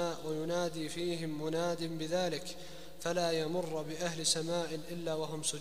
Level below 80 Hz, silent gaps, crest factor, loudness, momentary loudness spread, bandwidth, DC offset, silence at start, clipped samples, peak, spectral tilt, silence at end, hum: -64 dBFS; none; 20 dB; -36 LUFS; 8 LU; 15.5 kHz; 0.5%; 0 s; under 0.1%; -16 dBFS; -3.5 dB/octave; 0 s; none